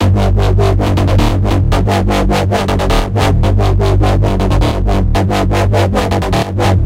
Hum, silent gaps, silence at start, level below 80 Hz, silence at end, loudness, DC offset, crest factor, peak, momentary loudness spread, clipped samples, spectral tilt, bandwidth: none; none; 0 s; -16 dBFS; 0 s; -13 LUFS; under 0.1%; 10 dB; 0 dBFS; 2 LU; under 0.1%; -6.5 dB/octave; 15 kHz